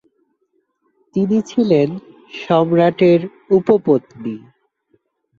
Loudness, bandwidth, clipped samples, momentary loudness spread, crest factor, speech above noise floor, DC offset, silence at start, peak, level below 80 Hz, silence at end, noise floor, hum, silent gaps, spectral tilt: -16 LUFS; 7.4 kHz; under 0.1%; 17 LU; 16 dB; 51 dB; under 0.1%; 1.15 s; -2 dBFS; -60 dBFS; 1 s; -66 dBFS; none; none; -8 dB/octave